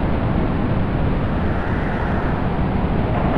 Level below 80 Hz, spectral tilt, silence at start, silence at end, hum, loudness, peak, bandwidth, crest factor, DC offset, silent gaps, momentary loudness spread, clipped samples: -26 dBFS; -9.5 dB/octave; 0 s; 0 s; none; -21 LUFS; -6 dBFS; 5.6 kHz; 12 dB; under 0.1%; none; 1 LU; under 0.1%